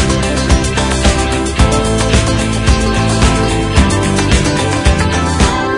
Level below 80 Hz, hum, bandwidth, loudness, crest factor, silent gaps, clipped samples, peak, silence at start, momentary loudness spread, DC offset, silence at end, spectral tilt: -18 dBFS; none; 11 kHz; -12 LUFS; 12 dB; none; under 0.1%; 0 dBFS; 0 s; 2 LU; under 0.1%; 0 s; -4.5 dB/octave